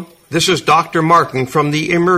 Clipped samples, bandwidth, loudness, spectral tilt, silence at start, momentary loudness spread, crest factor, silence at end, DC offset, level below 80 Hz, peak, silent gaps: under 0.1%; 15.5 kHz; -14 LUFS; -4.5 dB/octave; 0 s; 5 LU; 14 dB; 0 s; under 0.1%; -50 dBFS; 0 dBFS; none